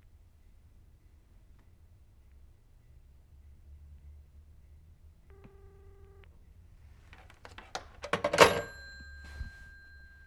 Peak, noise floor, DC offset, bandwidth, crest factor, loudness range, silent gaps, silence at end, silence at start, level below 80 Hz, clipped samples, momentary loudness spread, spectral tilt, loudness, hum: -6 dBFS; -59 dBFS; under 0.1%; 18 kHz; 32 dB; 26 LU; none; 0.75 s; 3.7 s; -54 dBFS; under 0.1%; 33 LU; -3 dB/octave; -29 LUFS; none